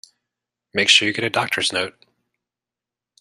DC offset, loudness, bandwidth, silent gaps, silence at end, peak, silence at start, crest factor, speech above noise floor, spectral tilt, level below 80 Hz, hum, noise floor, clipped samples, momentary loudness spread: under 0.1%; -18 LUFS; 15 kHz; none; 1.3 s; -2 dBFS; 0.75 s; 22 dB; 69 dB; -1.5 dB/octave; -68 dBFS; none; -88 dBFS; under 0.1%; 13 LU